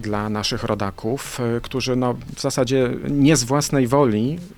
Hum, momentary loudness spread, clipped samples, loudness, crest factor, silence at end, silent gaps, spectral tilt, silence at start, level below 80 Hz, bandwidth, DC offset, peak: none; 8 LU; under 0.1%; -20 LUFS; 16 dB; 0.05 s; none; -5 dB/octave; 0 s; -42 dBFS; 19 kHz; under 0.1%; -4 dBFS